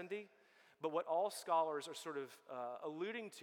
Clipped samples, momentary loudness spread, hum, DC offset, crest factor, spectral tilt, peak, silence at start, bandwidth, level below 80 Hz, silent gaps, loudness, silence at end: under 0.1%; 11 LU; none; under 0.1%; 18 dB; -3.5 dB/octave; -24 dBFS; 0 s; 18 kHz; under -90 dBFS; none; -42 LUFS; 0 s